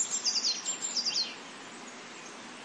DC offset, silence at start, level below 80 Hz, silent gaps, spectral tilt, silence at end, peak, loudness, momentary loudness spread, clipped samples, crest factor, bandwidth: under 0.1%; 0 s; -88 dBFS; none; 1 dB/octave; 0 s; -18 dBFS; -29 LUFS; 17 LU; under 0.1%; 18 dB; 11.5 kHz